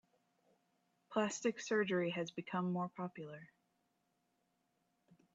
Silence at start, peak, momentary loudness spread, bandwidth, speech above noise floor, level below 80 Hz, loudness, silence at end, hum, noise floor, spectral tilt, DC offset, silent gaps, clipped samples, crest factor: 1.1 s; -22 dBFS; 13 LU; 8 kHz; 43 dB; -86 dBFS; -39 LUFS; 0.2 s; none; -82 dBFS; -5 dB/octave; under 0.1%; none; under 0.1%; 20 dB